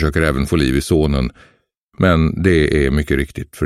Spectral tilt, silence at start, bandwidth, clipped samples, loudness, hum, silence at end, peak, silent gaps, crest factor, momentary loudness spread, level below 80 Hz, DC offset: -6.5 dB/octave; 0 s; 15 kHz; under 0.1%; -16 LUFS; none; 0 s; 0 dBFS; 1.77-1.89 s; 16 dB; 6 LU; -26 dBFS; under 0.1%